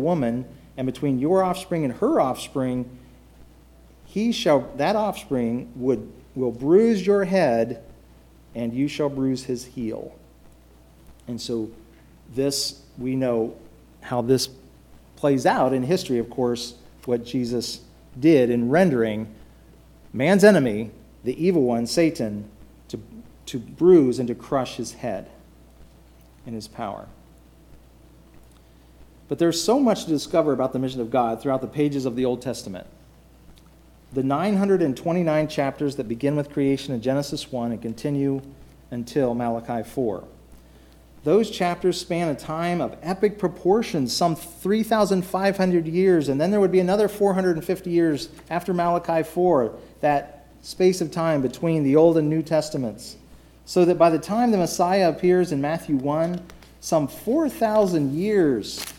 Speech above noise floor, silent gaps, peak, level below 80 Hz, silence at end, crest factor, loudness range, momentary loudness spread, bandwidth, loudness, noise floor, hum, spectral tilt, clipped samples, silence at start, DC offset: 29 dB; none; -2 dBFS; -52 dBFS; 0 s; 20 dB; 8 LU; 14 LU; 17 kHz; -23 LUFS; -51 dBFS; none; -6 dB/octave; under 0.1%; 0 s; under 0.1%